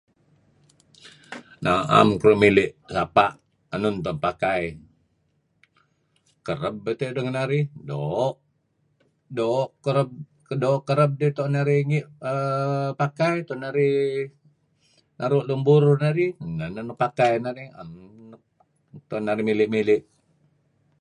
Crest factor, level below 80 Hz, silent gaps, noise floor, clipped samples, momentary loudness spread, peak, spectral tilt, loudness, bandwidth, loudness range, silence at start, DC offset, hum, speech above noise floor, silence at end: 22 dB; -56 dBFS; none; -69 dBFS; under 0.1%; 15 LU; -2 dBFS; -7.5 dB/octave; -23 LUFS; 11 kHz; 8 LU; 1.05 s; under 0.1%; none; 47 dB; 1 s